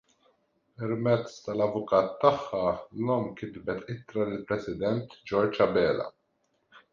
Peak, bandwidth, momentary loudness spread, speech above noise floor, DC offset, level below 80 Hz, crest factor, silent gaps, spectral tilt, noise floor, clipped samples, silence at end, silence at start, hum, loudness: -8 dBFS; 7.4 kHz; 11 LU; 46 dB; under 0.1%; -60 dBFS; 22 dB; none; -7.5 dB/octave; -74 dBFS; under 0.1%; 0.15 s; 0.8 s; none; -29 LUFS